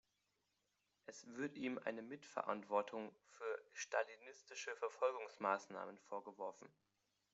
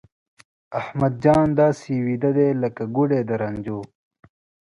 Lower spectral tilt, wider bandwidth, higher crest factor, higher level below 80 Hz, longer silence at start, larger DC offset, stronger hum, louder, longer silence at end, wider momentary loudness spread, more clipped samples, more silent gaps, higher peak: second, -2.5 dB/octave vs -9 dB/octave; second, 8 kHz vs 11 kHz; first, 24 dB vs 18 dB; second, under -90 dBFS vs -52 dBFS; first, 1.1 s vs 0.7 s; neither; neither; second, -46 LUFS vs -21 LUFS; second, 0.65 s vs 0.85 s; about the same, 14 LU vs 13 LU; neither; neither; second, -24 dBFS vs -4 dBFS